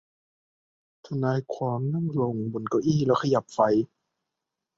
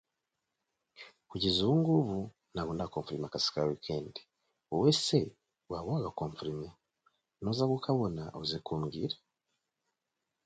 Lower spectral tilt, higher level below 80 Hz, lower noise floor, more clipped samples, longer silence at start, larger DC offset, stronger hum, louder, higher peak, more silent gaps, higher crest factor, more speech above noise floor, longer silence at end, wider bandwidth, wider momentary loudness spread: first, -7.5 dB/octave vs -6 dB/octave; about the same, -64 dBFS vs -60 dBFS; about the same, -85 dBFS vs -87 dBFS; neither; about the same, 1.05 s vs 1 s; neither; neither; first, -26 LUFS vs -33 LUFS; first, -8 dBFS vs -14 dBFS; neither; about the same, 20 dB vs 22 dB; first, 60 dB vs 54 dB; second, 0.95 s vs 1.3 s; second, 7.8 kHz vs 9.2 kHz; second, 7 LU vs 15 LU